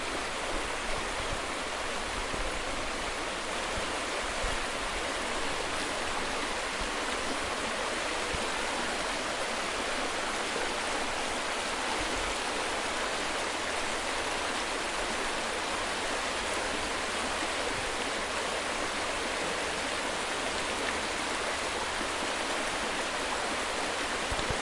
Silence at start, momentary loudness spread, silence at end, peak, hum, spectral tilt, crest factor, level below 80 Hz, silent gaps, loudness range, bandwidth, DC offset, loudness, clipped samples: 0 s; 2 LU; 0 s; -14 dBFS; none; -2 dB/octave; 18 dB; -48 dBFS; none; 1 LU; 11.5 kHz; under 0.1%; -31 LUFS; under 0.1%